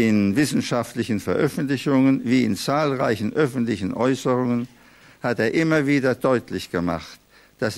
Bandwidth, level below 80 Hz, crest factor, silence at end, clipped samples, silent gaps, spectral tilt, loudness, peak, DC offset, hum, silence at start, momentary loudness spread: 14 kHz; -56 dBFS; 14 dB; 0 s; under 0.1%; none; -6 dB/octave; -22 LUFS; -6 dBFS; under 0.1%; none; 0 s; 8 LU